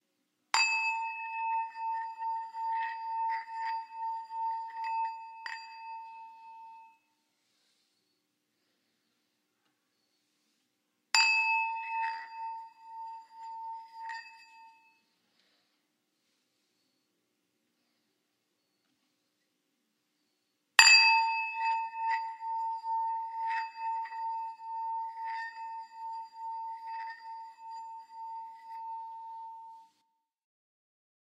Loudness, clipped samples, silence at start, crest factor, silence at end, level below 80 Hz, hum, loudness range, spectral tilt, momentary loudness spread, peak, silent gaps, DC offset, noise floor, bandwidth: -30 LUFS; under 0.1%; 0.55 s; 36 dB; 1.4 s; under -90 dBFS; none; 21 LU; 5.5 dB/octave; 21 LU; 0 dBFS; none; under 0.1%; -80 dBFS; 14.5 kHz